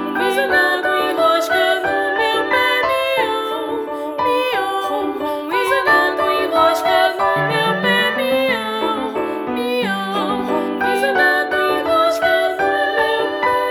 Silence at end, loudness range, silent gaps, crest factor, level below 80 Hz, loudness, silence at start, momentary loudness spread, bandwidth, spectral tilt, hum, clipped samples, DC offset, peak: 0 s; 3 LU; none; 16 dB; -54 dBFS; -17 LUFS; 0 s; 7 LU; over 20 kHz; -4 dB/octave; none; under 0.1%; under 0.1%; -2 dBFS